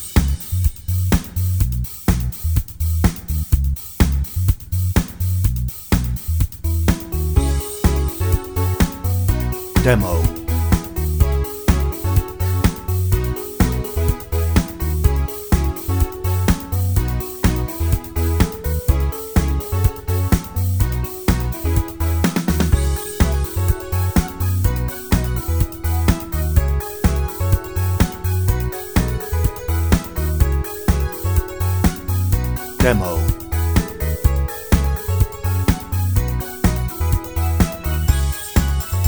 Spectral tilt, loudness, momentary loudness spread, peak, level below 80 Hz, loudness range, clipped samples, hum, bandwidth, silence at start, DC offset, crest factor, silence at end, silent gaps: -6 dB/octave; -20 LUFS; 3 LU; 0 dBFS; -22 dBFS; 1 LU; under 0.1%; none; over 20 kHz; 0 s; 0.2%; 18 dB; 0 s; none